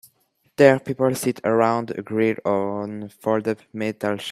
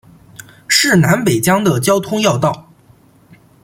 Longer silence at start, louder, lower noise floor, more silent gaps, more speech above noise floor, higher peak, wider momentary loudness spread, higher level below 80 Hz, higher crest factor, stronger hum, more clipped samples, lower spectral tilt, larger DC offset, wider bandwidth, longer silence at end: about the same, 0.6 s vs 0.7 s; second, -22 LUFS vs -13 LUFS; first, -65 dBFS vs -48 dBFS; neither; first, 44 dB vs 35 dB; about the same, 0 dBFS vs 0 dBFS; first, 12 LU vs 8 LU; second, -66 dBFS vs -50 dBFS; first, 22 dB vs 16 dB; neither; neither; first, -6 dB/octave vs -4.5 dB/octave; neither; second, 14.5 kHz vs 16.5 kHz; second, 0 s vs 1.05 s